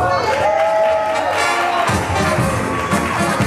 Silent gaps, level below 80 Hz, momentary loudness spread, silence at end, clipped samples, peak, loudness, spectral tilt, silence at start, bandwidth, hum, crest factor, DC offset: none; -38 dBFS; 3 LU; 0 s; under 0.1%; -4 dBFS; -16 LUFS; -4.5 dB/octave; 0 s; 14 kHz; none; 12 dB; under 0.1%